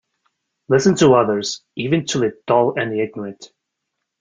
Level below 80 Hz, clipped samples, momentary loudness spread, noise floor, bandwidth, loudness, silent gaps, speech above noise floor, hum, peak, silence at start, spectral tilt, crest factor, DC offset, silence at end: -58 dBFS; under 0.1%; 12 LU; -78 dBFS; 9.6 kHz; -18 LUFS; none; 61 dB; none; -2 dBFS; 0.7 s; -5 dB/octave; 18 dB; under 0.1%; 0.75 s